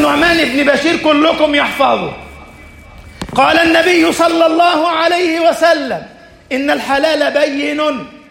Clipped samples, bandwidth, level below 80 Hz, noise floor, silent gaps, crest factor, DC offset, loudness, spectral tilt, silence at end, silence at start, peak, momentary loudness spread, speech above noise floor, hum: under 0.1%; 16.5 kHz; -42 dBFS; -36 dBFS; none; 12 dB; under 0.1%; -12 LUFS; -3.5 dB/octave; 0.15 s; 0 s; 0 dBFS; 10 LU; 24 dB; none